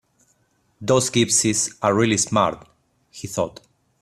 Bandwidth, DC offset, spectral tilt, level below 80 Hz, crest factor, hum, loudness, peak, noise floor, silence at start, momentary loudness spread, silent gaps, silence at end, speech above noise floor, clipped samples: 15 kHz; under 0.1%; -3.5 dB/octave; -56 dBFS; 18 dB; none; -20 LUFS; -4 dBFS; -65 dBFS; 0.8 s; 14 LU; none; 0.5 s; 44 dB; under 0.1%